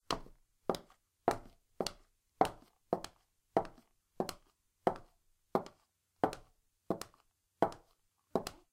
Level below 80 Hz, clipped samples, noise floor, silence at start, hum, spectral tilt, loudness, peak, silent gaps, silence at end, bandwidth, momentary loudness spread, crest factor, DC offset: -62 dBFS; under 0.1%; -76 dBFS; 0.1 s; none; -5 dB/octave; -39 LUFS; -10 dBFS; none; 0.2 s; 16 kHz; 15 LU; 32 dB; under 0.1%